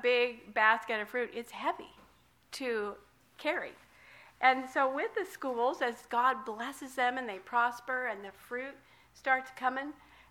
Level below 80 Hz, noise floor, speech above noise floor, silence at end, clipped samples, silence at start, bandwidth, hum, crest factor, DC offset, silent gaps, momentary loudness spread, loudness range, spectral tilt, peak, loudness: -74 dBFS; -64 dBFS; 32 dB; 0.4 s; under 0.1%; 0 s; 17 kHz; none; 22 dB; under 0.1%; none; 13 LU; 4 LU; -2.5 dB/octave; -12 dBFS; -33 LUFS